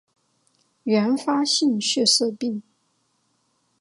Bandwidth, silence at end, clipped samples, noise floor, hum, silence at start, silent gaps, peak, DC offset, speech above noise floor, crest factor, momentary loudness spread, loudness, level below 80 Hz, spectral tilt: 11.5 kHz; 1.2 s; under 0.1%; -69 dBFS; none; 0.85 s; none; -6 dBFS; under 0.1%; 48 dB; 18 dB; 12 LU; -21 LUFS; -78 dBFS; -3 dB/octave